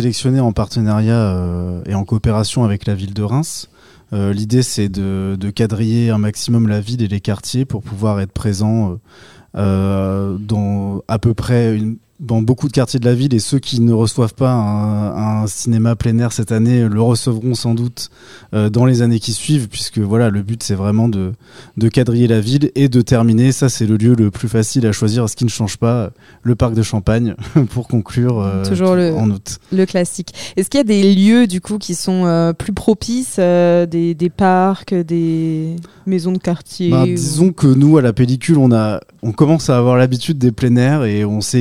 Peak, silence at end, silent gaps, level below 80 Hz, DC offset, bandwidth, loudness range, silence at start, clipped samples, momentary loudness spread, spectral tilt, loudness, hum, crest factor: 0 dBFS; 0 s; none; -40 dBFS; 0.6%; 14 kHz; 5 LU; 0 s; under 0.1%; 8 LU; -6.5 dB/octave; -15 LUFS; none; 14 dB